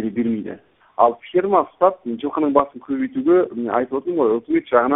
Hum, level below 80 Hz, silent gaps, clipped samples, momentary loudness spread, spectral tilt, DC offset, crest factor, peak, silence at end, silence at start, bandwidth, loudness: none; -60 dBFS; none; under 0.1%; 9 LU; -11.5 dB/octave; under 0.1%; 18 dB; 0 dBFS; 0 s; 0 s; 3.9 kHz; -20 LUFS